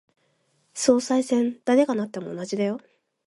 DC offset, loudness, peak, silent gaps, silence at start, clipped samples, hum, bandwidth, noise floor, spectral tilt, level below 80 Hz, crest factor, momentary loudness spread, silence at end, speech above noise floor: under 0.1%; -24 LUFS; -6 dBFS; none; 0.75 s; under 0.1%; none; 11.5 kHz; -68 dBFS; -4.5 dB/octave; -70 dBFS; 20 dB; 12 LU; 0.5 s; 45 dB